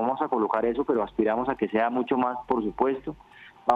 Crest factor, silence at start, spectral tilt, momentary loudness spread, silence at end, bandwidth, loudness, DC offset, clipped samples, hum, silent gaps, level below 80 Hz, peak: 22 dB; 0 s; -7.5 dB/octave; 4 LU; 0 s; 5.2 kHz; -26 LUFS; under 0.1%; under 0.1%; none; none; -56 dBFS; -4 dBFS